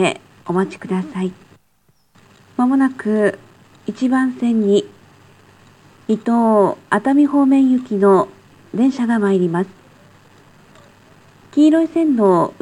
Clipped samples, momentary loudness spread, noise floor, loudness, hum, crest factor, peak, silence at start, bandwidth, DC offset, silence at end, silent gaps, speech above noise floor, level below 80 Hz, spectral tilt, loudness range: under 0.1%; 13 LU; -61 dBFS; -17 LUFS; none; 16 dB; 0 dBFS; 0 s; 11 kHz; under 0.1%; 0.1 s; none; 45 dB; -66 dBFS; -7 dB/octave; 6 LU